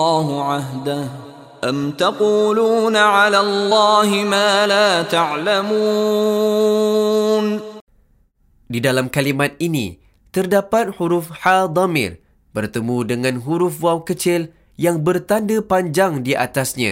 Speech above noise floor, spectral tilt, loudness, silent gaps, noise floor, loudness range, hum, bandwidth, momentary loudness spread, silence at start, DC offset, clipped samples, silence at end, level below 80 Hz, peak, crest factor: 40 dB; -4.5 dB/octave; -17 LUFS; 7.81-7.87 s; -57 dBFS; 6 LU; none; 16 kHz; 10 LU; 0 s; under 0.1%; under 0.1%; 0 s; -56 dBFS; 0 dBFS; 18 dB